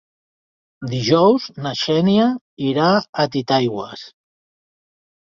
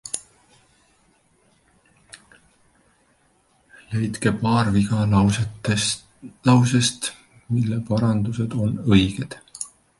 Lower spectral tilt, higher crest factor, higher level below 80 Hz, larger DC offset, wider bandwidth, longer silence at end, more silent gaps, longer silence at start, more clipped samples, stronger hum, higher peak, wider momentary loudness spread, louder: about the same, -6.5 dB/octave vs -5.5 dB/octave; about the same, 18 dB vs 20 dB; second, -58 dBFS vs -46 dBFS; neither; second, 7.4 kHz vs 11.5 kHz; first, 1.25 s vs 0.3 s; first, 2.41-2.57 s, 3.09-3.13 s vs none; first, 0.8 s vs 0.05 s; neither; neither; about the same, -2 dBFS vs -4 dBFS; about the same, 14 LU vs 13 LU; first, -18 LUFS vs -21 LUFS